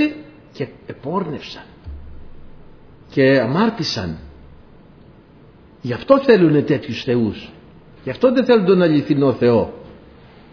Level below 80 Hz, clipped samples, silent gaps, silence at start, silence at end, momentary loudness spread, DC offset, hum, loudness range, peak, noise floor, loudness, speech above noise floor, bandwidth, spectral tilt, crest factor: -46 dBFS; under 0.1%; none; 0 s; 0.6 s; 22 LU; under 0.1%; none; 5 LU; 0 dBFS; -46 dBFS; -17 LUFS; 30 dB; 5.4 kHz; -7 dB/octave; 18 dB